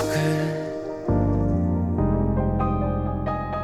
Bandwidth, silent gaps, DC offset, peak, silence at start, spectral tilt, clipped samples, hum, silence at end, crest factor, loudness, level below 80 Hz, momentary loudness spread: 14.5 kHz; none; under 0.1%; -10 dBFS; 0 s; -7.5 dB/octave; under 0.1%; none; 0 s; 14 dB; -24 LUFS; -32 dBFS; 5 LU